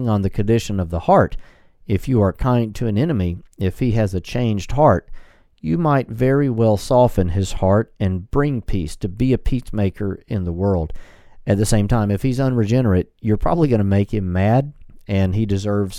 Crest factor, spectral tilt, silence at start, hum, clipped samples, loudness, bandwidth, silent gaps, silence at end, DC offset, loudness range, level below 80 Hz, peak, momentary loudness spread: 16 dB; -7.5 dB/octave; 0 s; none; under 0.1%; -19 LUFS; 14 kHz; none; 0 s; under 0.1%; 3 LU; -32 dBFS; -2 dBFS; 8 LU